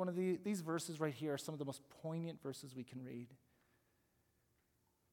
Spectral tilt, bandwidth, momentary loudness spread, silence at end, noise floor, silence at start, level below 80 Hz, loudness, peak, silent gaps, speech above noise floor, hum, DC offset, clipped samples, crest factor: -6 dB/octave; 18 kHz; 11 LU; 1.75 s; -80 dBFS; 0 s; -88 dBFS; -44 LUFS; -26 dBFS; none; 36 dB; none; under 0.1%; under 0.1%; 20 dB